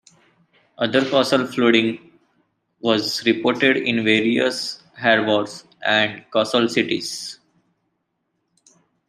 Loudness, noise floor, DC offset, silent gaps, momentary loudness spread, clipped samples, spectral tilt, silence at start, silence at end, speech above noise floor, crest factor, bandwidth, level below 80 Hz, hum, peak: -19 LUFS; -73 dBFS; under 0.1%; none; 10 LU; under 0.1%; -4 dB/octave; 0.8 s; 1.75 s; 54 dB; 20 dB; 14 kHz; -66 dBFS; none; -2 dBFS